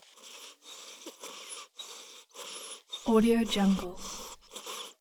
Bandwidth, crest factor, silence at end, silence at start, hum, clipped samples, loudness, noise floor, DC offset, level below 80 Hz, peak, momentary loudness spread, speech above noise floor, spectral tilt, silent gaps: 19.5 kHz; 20 dB; 0.1 s; 0.25 s; none; under 0.1%; -31 LUFS; -51 dBFS; under 0.1%; -56 dBFS; -12 dBFS; 21 LU; 24 dB; -5 dB/octave; none